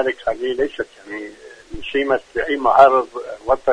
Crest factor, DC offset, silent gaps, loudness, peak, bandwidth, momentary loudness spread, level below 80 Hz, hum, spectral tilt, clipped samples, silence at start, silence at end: 18 dB; under 0.1%; none; -18 LUFS; 0 dBFS; 10 kHz; 20 LU; -46 dBFS; none; -5 dB/octave; under 0.1%; 0 s; 0 s